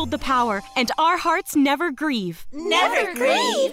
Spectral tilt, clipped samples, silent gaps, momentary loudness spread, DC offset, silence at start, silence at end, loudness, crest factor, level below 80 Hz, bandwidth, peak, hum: -3 dB/octave; under 0.1%; none; 6 LU; under 0.1%; 0 s; 0 s; -20 LUFS; 14 dB; -46 dBFS; 16 kHz; -8 dBFS; none